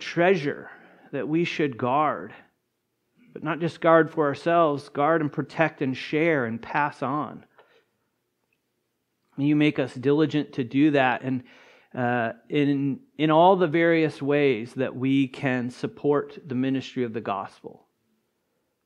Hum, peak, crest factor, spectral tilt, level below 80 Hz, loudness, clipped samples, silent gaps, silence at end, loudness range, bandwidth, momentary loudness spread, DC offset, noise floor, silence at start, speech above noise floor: none; -4 dBFS; 22 dB; -7.5 dB/octave; -74 dBFS; -24 LUFS; under 0.1%; none; 1.15 s; 6 LU; 10 kHz; 12 LU; under 0.1%; -76 dBFS; 0 s; 52 dB